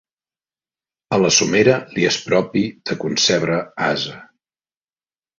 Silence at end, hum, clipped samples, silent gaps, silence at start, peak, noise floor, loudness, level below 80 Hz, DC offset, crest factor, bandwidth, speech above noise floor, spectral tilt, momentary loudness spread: 1.15 s; none; under 0.1%; none; 1.1 s; -2 dBFS; under -90 dBFS; -18 LUFS; -58 dBFS; under 0.1%; 18 dB; 7.8 kHz; over 72 dB; -3.5 dB/octave; 9 LU